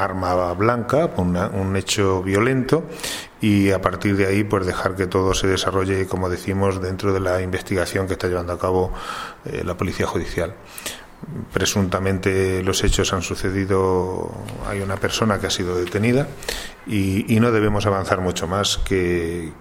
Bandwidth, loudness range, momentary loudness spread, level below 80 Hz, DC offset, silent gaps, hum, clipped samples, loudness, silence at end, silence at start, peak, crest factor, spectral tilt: 16.5 kHz; 4 LU; 9 LU; -36 dBFS; under 0.1%; none; none; under 0.1%; -21 LUFS; 0 s; 0 s; 0 dBFS; 20 dB; -5 dB/octave